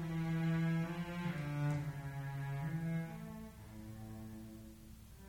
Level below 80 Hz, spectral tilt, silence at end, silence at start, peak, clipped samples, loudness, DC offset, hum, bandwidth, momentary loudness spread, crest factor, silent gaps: -60 dBFS; -7.5 dB/octave; 0 s; 0 s; -26 dBFS; under 0.1%; -41 LUFS; under 0.1%; none; 16.5 kHz; 17 LU; 14 dB; none